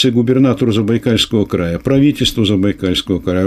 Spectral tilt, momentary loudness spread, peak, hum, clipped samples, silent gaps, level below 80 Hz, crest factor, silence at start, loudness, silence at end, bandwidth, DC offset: -6 dB/octave; 5 LU; -2 dBFS; none; under 0.1%; none; -36 dBFS; 12 dB; 0 s; -14 LUFS; 0 s; 15 kHz; under 0.1%